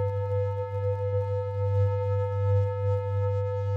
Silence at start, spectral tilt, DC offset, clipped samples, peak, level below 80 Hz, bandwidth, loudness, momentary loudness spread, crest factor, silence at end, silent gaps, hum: 0 s; -9 dB/octave; under 0.1%; under 0.1%; -16 dBFS; -60 dBFS; 3.9 kHz; -28 LUFS; 4 LU; 10 dB; 0 s; none; none